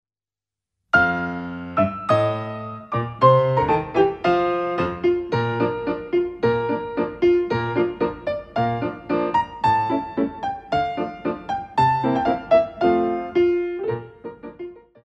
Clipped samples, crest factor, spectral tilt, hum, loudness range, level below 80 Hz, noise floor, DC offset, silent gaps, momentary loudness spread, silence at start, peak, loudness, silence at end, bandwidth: under 0.1%; 18 dB; -8 dB/octave; none; 3 LU; -50 dBFS; under -90 dBFS; under 0.1%; none; 10 LU; 0.95 s; -2 dBFS; -22 LUFS; 0.25 s; 8 kHz